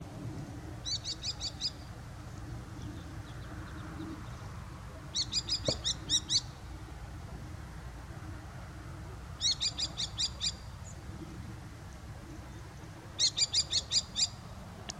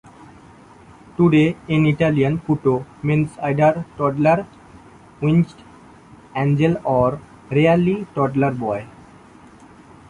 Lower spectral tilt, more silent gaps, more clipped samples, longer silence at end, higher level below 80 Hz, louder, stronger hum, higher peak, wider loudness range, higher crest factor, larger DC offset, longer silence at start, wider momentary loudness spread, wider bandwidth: second, -2 dB/octave vs -8.5 dB/octave; neither; neither; second, 0 s vs 1.2 s; about the same, -50 dBFS vs -50 dBFS; second, -33 LUFS vs -19 LUFS; neither; second, -14 dBFS vs -4 dBFS; first, 9 LU vs 3 LU; first, 24 dB vs 16 dB; neither; second, 0 s vs 1.2 s; first, 18 LU vs 9 LU; first, 16 kHz vs 10.5 kHz